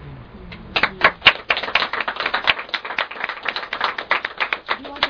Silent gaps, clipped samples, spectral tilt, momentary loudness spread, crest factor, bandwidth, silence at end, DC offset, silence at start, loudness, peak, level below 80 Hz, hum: none; under 0.1%; -3.5 dB/octave; 12 LU; 22 dB; 5.4 kHz; 0 s; under 0.1%; 0 s; -19 LUFS; 0 dBFS; -48 dBFS; none